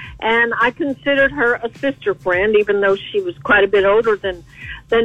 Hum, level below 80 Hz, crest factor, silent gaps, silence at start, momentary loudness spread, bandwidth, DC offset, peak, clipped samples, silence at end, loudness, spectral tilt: none; -44 dBFS; 14 dB; none; 0 s; 9 LU; 8.2 kHz; 0.1%; -2 dBFS; under 0.1%; 0 s; -16 LUFS; -6 dB/octave